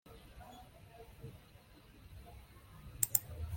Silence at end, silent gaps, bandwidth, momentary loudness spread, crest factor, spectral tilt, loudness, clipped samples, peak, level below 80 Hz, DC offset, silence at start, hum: 0 s; none; 16.5 kHz; 27 LU; 36 dB; -2.5 dB/octave; -34 LUFS; under 0.1%; -8 dBFS; -58 dBFS; under 0.1%; 0.05 s; none